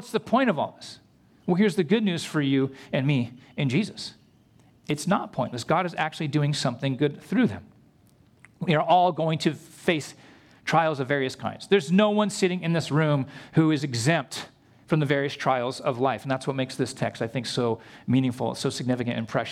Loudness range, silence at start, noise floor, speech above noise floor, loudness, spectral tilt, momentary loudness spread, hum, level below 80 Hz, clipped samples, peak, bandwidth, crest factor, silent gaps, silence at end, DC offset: 4 LU; 0 s; -58 dBFS; 33 dB; -25 LUFS; -6 dB/octave; 9 LU; none; -66 dBFS; under 0.1%; -8 dBFS; 14.5 kHz; 18 dB; none; 0 s; under 0.1%